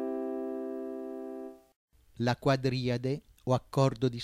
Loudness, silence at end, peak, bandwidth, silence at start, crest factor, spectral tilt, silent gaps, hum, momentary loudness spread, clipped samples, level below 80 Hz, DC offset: -32 LUFS; 0 s; -14 dBFS; 13 kHz; 0 s; 18 dB; -7 dB/octave; 1.76-1.88 s; none; 13 LU; under 0.1%; -60 dBFS; under 0.1%